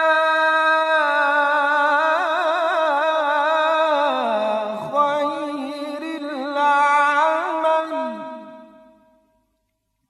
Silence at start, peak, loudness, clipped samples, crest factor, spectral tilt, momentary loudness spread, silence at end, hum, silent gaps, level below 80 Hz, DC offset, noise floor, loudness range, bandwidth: 0 s; -6 dBFS; -19 LUFS; under 0.1%; 14 dB; -3 dB/octave; 12 LU; 1.45 s; none; none; -76 dBFS; under 0.1%; -72 dBFS; 4 LU; 12 kHz